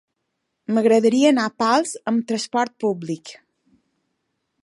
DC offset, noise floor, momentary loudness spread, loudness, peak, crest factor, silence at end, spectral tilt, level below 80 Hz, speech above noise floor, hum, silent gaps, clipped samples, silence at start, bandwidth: under 0.1%; -76 dBFS; 15 LU; -20 LUFS; -4 dBFS; 18 dB; 1.3 s; -4.5 dB/octave; -74 dBFS; 57 dB; none; none; under 0.1%; 0.7 s; 11.5 kHz